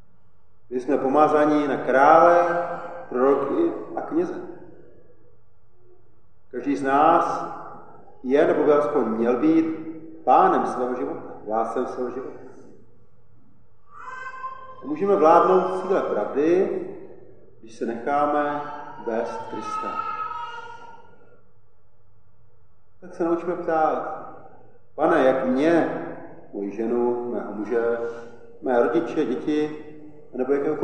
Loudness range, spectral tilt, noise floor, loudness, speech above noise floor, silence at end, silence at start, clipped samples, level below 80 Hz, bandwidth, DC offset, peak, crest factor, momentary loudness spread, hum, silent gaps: 12 LU; -7 dB/octave; -62 dBFS; -22 LUFS; 41 dB; 0 s; 0.7 s; under 0.1%; -68 dBFS; 9.2 kHz; 0.9%; -2 dBFS; 22 dB; 19 LU; none; none